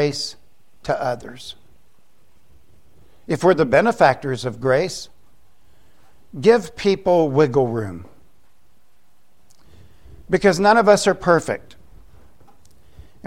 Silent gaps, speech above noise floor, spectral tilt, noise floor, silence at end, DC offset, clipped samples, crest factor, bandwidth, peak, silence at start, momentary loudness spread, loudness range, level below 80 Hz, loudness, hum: none; 46 dB; -5.5 dB/octave; -63 dBFS; 1.7 s; 0.7%; under 0.1%; 20 dB; 15.5 kHz; 0 dBFS; 0 s; 18 LU; 6 LU; -50 dBFS; -18 LUFS; none